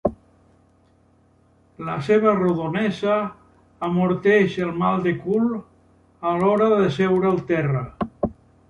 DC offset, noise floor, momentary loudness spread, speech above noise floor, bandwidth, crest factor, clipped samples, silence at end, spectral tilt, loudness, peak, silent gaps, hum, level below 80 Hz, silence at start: under 0.1%; -58 dBFS; 11 LU; 38 dB; 10.5 kHz; 18 dB; under 0.1%; 0.4 s; -8 dB/octave; -21 LUFS; -4 dBFS; none; none; -52 dBFS; 0.05 s